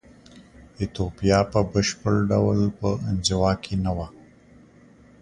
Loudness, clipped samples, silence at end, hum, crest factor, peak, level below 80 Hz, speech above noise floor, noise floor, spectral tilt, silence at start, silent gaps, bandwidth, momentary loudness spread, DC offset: -23 LUFS; under 0.1%; 1.1 s; none; 20 dB; -4 dBFS; -40 dBFS; 29 dB; -52 dBFS; -5.5 dB/octave; 0.35 s; none; 11 kHz; 9 LU; under 0.1%